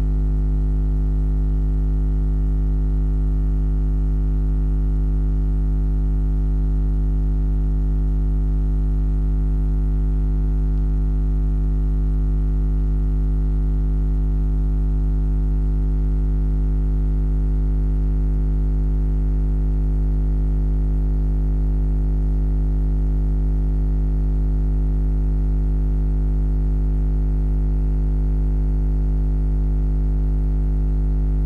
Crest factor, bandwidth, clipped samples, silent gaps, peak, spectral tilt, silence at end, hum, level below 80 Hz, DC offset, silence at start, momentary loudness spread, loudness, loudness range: 4 dB; 1.9 kHz; under 0.1%; none; -16 dBFS; -11 dB/octave; 0 s; 50 Hz at -20 dBFS; -18 dBFS; under 0.1%; 0 s; 0 LU; -22 LUFS; 0 LU